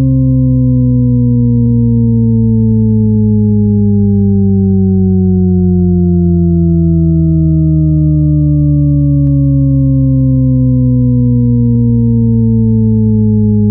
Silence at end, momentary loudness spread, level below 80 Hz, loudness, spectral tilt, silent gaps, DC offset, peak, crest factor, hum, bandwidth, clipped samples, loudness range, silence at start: 0 s; 0 LU; -22 dBFS; -10 LUFS; -16.5 dB/octave; none; under 0.1%; 0 dBFS; 8 dB; none; 1.2 kHz; under 0.1%; 0 LU; 0 s